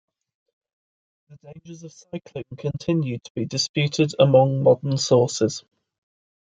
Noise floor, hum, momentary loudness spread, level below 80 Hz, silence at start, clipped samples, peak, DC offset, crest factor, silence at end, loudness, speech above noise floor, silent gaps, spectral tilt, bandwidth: under -90 dBFS; none; 21 LU; -62 dBFS; 1.3 s; under 0.1%; -2 dBFS; under 0.1%; 20 dB; 0.9 s; -21 LUFS; over 68 dB; 3.30-3.35 s, 3.69-3.74 s; -5.5 dB/octave; 9.2 kHz